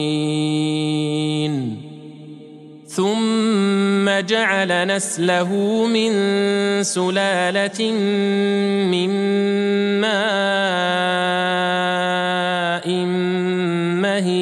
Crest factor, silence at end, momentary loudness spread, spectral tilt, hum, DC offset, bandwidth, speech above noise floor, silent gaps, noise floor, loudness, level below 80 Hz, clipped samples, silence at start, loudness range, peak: 16 dB; 0 s; 3 LU; -4.5 dB/octave; none; under 0.1%; 12.5 kHz; 21 dB; none; -40 dBFS; -19 LUFS; -72 dBFS; under 0.1%; 0 s; 3 LU; -4 dBFS